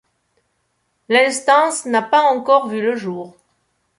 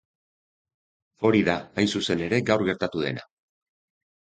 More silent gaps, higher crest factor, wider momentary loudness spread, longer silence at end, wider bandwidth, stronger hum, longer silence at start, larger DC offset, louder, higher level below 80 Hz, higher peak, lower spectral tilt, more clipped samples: neither; second, 16 dB vs 22 dB; first, 13 LU vs 7 LU; second, 0.7 s vs 1.1 s; first, 11.5 kHz vs 9.4 kHz; neither; about the same, 1.1 s vs 1.2 s; neither; first, -16 LUFS vs -24 LUFS; second, -70 dBFS vs -56 dBFS; first, -2 dBFS vs -6 dBFS; second, -3 dB/octave vs -5.5 dB/octave; neither